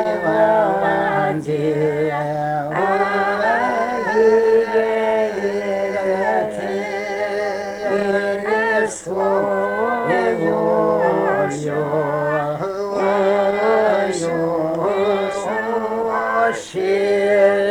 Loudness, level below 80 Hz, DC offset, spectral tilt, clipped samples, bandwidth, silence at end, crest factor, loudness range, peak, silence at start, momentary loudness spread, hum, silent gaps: -18 LUFS; -56 dBFS; under 0.1%; -5.5 dB/octave; under 0.1%; 14.5 kHz; 0 s; 14 dB; 3 LU; -4 dBFS; 0 s; 6 LU; none; none